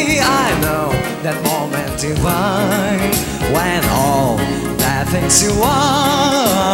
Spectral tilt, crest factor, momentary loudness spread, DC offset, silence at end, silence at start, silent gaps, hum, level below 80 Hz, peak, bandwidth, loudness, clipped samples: -4 dB/octave; 14 dB; 7 LU; under 0.1%; 0 s; 0 s; none; none; -32 dBFS; 0 dBFS; 16.5 kHz; -15 LUFS; under 0.1%